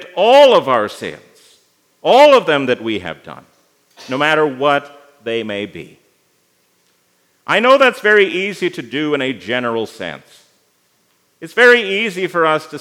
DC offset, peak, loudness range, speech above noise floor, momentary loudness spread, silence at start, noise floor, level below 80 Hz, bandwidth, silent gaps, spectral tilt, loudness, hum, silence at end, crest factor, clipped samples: under 0.1%; 0 dBFS; 6 LU; 46 dB; 19 LU; 0 s; -60 dBFS; -68 dBFS; 15.5 kHz; none; -4 dB/octave; -14 LUFS; none; 0 s; 16 dB; under 0.1%